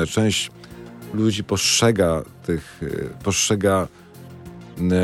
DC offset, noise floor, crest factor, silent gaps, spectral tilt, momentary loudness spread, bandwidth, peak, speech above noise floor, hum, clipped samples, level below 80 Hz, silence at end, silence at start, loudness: under 0.1%; -40 dBFS; 18 dB; none; -4 dB/octave; 23 LU; 16.5 kHz; -4 dBFS; 19 dB; none; under 0.1%; -48 dBFS; 0 s; 0 s; -21 LUFS